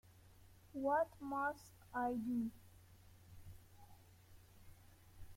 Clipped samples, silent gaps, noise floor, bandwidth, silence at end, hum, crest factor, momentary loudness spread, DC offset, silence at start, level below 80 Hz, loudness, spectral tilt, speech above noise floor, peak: under 0.1%; none; -64 dBFS; 16.5 kHz; 0 s; none; 20 dB; 26 LU; under 0.1%; 0.05 s; -68 dBFS; -42 LUFS; -6.5 dB/octave; 23 dB; -26 dBFS